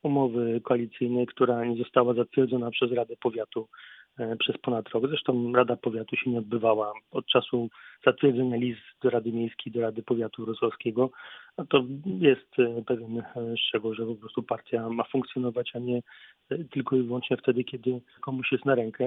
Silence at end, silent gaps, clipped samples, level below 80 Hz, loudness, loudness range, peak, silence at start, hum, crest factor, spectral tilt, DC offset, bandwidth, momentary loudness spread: 0 s; none; under 0.1%; -72 dBFS; -28 LUFS; 4 LU; -6 dBFS; 0.05 s; none; 22 dB; -9.5 dB/octave; under 0.1%; 4 kHz; 10 LU